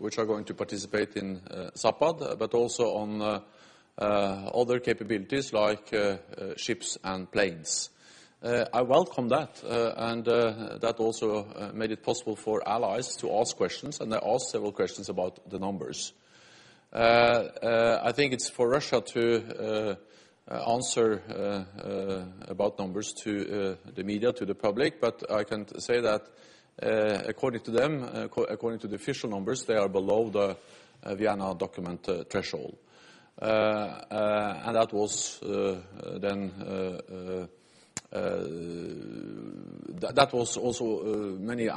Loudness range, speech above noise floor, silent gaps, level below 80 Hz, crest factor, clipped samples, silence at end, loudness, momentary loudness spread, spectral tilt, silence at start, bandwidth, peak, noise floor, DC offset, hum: 5 LU; 27 dB; none; -64 dBFS; 26 dB; under 0.1%; 0 s; -30 LUFS; 12 LU; -4 dB/octave; 0 s; 11.5 kHz; -4 dBFS; -56 dBFS; under 0.1%; none